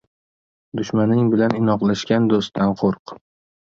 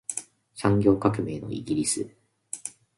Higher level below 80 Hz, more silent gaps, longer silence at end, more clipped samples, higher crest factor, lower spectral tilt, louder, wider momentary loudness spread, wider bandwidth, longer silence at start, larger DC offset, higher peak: about the same, -54 dBFS vs -54 dBFS; first, 2.99-3.06 s vs none; first, 0.45 s vs 0.3 s; neither; about the same, 16 dB vs 20 dB; first, -7 dB/octave vs -5.5 dB/octave; first, -19 LUFS vs -26 LUFS; second, 9 LU vs 16 LU; second, 7.4 kHz vs 11.5 kHz; first, 0.75 s vs 0.1 s; neither; about the same, -4 dBFS vs -6 dBFS